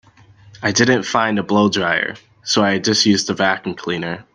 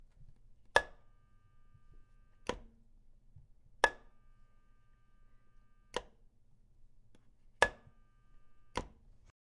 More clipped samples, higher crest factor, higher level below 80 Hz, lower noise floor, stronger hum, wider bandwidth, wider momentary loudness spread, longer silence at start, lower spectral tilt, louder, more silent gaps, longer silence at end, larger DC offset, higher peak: neither; second, 18 dB vs 34 dB; about the same, -58 dBFS vs -60 dBFS; second, -47 dBFS vs -64 dBFS; neither; second, 9.8 kHz vs 11 kHz; second, 9 LU vs 19 LU; first, 0.55 s vs 0.2 s; about the same, -3.5 dB/octave vs -2.5 dB/octave; first, -17 LUFS vs -36 LUFS; neither; second, 0.1 s vs 0.55 s; neither; first, 0 dBFS vs -8 dBFS